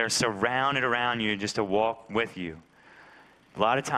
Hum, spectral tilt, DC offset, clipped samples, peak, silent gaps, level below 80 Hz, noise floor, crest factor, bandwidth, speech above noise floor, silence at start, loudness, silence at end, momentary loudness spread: none; -3.5 dB/octave; under 0.1%; under 0.1%; -8 dBFS; none; -62 dBFS; -55 dBFS; 20 dB; 15 kHz; 28 dB; 0 s; -27 LUFS; 0 s; 9 LU